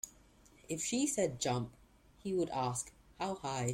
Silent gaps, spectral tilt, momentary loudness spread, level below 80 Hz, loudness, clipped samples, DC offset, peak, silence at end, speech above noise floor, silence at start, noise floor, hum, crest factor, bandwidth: none; -4.5 dB/octave; 13 LU; -64 dBFS; -37 LUFS; under 0.1%; under 0.1%; -20 dBFS; 0 s; 27 dB; 0.05 s; -63 dBFS; none; 18 dB; 16.5 kHz